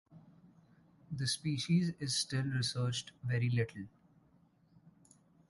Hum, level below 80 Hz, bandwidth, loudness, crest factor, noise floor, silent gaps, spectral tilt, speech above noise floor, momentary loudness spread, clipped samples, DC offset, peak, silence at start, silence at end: none; -68 dBFS; 11.5 kHz; -35 LUFS; 18 dB; -68 dBFS; none; -4.5 dB/octave; 34 dB; 8 LU; under 0.1%; under 0.1%; -20 dBFS; 0.1 s; 1.65 s